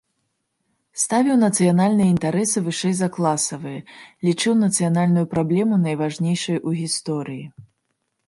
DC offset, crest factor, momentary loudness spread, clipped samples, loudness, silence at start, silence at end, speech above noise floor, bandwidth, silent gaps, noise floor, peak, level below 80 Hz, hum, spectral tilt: under 0.1%; 16 dB; 10 LU; under 0.1%; -20 LUFS; 0.95 s; 0.65 s; 54 dB; 11.5 kHz; none; -74 dBFS; -6 dBFS; -60 dBFS; none; -5 dB/octave